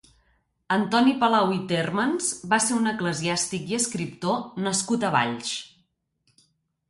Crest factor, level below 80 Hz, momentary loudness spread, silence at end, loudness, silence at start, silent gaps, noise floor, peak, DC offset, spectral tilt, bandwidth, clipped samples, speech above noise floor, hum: 18 dB; -64 dBFS; 7 LU; 1.25 s; -24 LUFS; 0.7 s; none; -70 dBFS; -8 dBFS; under 0.1%; -3.5 dB/octave; 11.5 kHz; under 0.1%; 46 dB; none